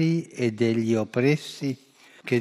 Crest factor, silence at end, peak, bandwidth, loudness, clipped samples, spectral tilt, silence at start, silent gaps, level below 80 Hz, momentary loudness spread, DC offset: 16 dB; 0 s; -10 dBFS; 13.5 kHz; -25 LUFS; under 0.1%; -7 dB/octave; 0 s; none; -72 dBFS; 10 LU; under 0.1%